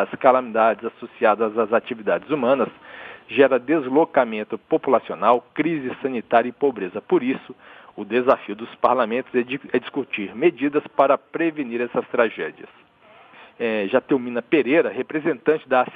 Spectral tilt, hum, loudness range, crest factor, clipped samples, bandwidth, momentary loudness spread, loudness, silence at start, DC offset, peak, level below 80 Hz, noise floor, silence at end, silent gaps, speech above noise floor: -8.5 dB/octave; none; 3 LU; 20 dB; under 0.1%; 4.9 kHz; 10 LU; -21 LUFS; 0 s; under 0.1%; -2 dBFS; -68 dBFS; -51 dBFS; 0 s; none; 30 dB